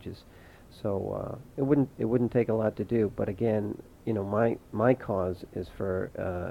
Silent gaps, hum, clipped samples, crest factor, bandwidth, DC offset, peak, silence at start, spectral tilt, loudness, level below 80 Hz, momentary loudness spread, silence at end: none; none; under 0.1%; 20 dB; 16.5 kHz; under 0.1%; -8 dBFS; 0 s; -9.5 dB/octave; -30 LUFS; -54 dBFS; 11 LU; 0 s